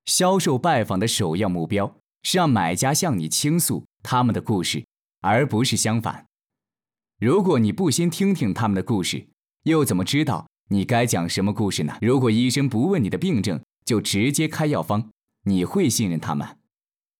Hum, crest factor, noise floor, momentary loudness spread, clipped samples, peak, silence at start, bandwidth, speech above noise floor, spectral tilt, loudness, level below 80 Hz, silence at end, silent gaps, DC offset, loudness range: none; 12 dB; under -90 dBFS; 9 LU; under 0.1%; -10 dBFS; 0.05 s; 19 kHz; over 69 dB; -5 dB/octave; -22 LUFS; -70 dBFS; 0.7 s; 10.60-10.64 s; under 0.1%; 2 LU